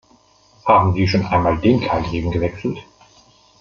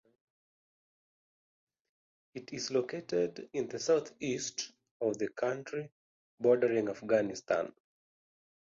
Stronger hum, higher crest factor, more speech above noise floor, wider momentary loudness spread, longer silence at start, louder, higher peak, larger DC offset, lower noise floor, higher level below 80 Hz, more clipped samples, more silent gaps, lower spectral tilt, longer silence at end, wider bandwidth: neither; about the same, 18 dB vs 20 dB; second, 37 dB vs over 57 dB; about the same, 12 LU vs 14 LU; second, 0.65 s vs 2.35 s; first, -18 LUFS vs -34 LUFS; first, -2 dBFS vs -14 dBFS; neither; second, -54 dBFS vs under -90 dBFS; first, -40 dBFS vs -76 dBFS; neither; second, none vs 4.91-5.00 s, 5.92-6.38 s; first, -7.5 dB/octave vs -4 dB/octave; second, 0.8 s vs 0.95 s; about the same, 7 kHz vs 7.6 kHz